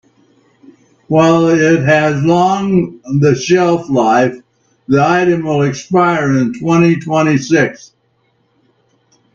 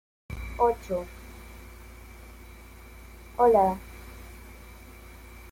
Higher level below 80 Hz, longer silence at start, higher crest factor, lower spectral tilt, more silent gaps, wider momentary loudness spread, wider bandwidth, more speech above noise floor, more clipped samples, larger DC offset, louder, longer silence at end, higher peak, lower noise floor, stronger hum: second, -52 dBFS vs -46 dBFS; first, 1.1 s vs 0.3 s; second, 14 dB vs 20 dB; about the same, -6.5 dB/octave vs -6.5 dB/octave; neither; second, 5 LU vs 26 LU; second, 7.6 kHz vs 16.5 kHz; first, 48 dB vs 24 dB; neither; neither; first, -12 LUFS vs -25 LUFS; first, 1.6 s vs 0.05 s; first, 0 dBFS vs -10 dBFS; first, -59 dBFS vs -47 dBFS; neither